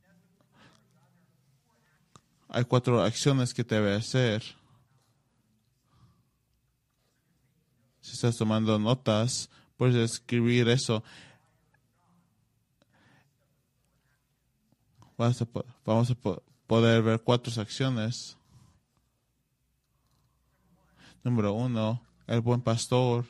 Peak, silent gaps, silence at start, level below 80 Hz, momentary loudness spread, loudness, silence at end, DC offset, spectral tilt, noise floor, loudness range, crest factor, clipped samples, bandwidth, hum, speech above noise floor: -8 dBFS; none; 2.5 s; -64 dBFS; 11 LU; -28 LUFS; 0.05 s; under 0.1%; -6 dB/octave; -75 dBFS; 10 LU; 22 dB; under 0.1%; 12 kHz; none; 49 dB